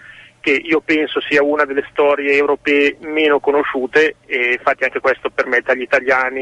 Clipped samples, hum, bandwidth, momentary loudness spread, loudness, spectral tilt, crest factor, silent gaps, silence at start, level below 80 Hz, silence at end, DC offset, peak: under 0.1%; none; 9 kHz; 4 LU; -16 LUFS; -4 dB/octave; 14 dB; none; 0.05 s; -54 dBFS; 0 s; under 0.1%; -2 dBFS